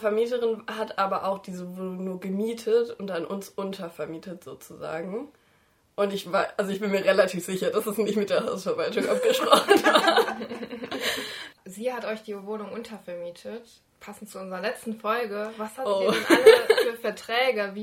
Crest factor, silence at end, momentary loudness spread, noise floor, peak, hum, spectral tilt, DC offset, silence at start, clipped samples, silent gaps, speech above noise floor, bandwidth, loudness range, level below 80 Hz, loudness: 24 dB; 0 s; 19 LU; -64 dBFS; -2 dBFS; none; -4 dB/octave; under 0.1%; 0 s; under 0.1%; none; 38 dB; 16.5 kHz; 11 LU; -70 dBFS; -25 LUFS